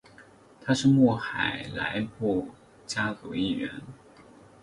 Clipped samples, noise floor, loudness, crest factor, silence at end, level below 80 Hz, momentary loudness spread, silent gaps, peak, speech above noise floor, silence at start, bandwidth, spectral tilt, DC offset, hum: under 0.1%; -54 dBFS; -27 LUFS; 20 dB; 0.65 s; -58 dBFS; 20 LU; none; -8 dBFS; 27 dB; 0.2 s; 11 kHz; -5.5 dB/octave; under 0.1%; none